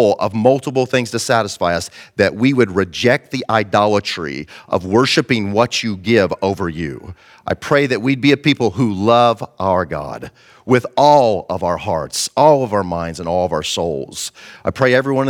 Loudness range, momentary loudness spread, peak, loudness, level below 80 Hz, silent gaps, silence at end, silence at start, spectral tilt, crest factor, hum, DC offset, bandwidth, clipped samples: 2 LU; 13 LU; 0 dBFS; -16 LUFS; -48 dBFS; none; 0 s; 0 s; -5 dB/octave; 16 dB; none; under 0.1%; 17 kHz; under 0.1%